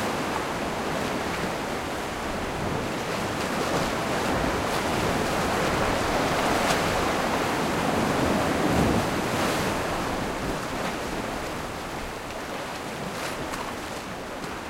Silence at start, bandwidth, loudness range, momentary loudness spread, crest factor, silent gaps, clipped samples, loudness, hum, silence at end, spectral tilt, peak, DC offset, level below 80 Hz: 0 s; 16 kHz; 7 LU; 9 LU; 20 dB; none; under 0.1%; -27 LUFS; none; 0 s; -4.5 dB/octave; -8 dBFS; under 0.1%; -42 dBFS